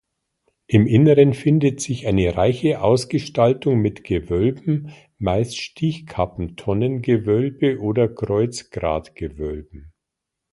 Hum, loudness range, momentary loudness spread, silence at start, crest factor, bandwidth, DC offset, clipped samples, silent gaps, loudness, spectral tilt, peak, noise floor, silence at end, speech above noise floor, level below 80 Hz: none; 6 LU; 11 LU; 0.7 s; 20 dB; 11.5 kHz; under 0.1%; under 0.1%; none; -20 LUFS; -7 dB/octave; 0 dBFS; -82 dBFS; 0.65 s; 63 dB; -40 dBFS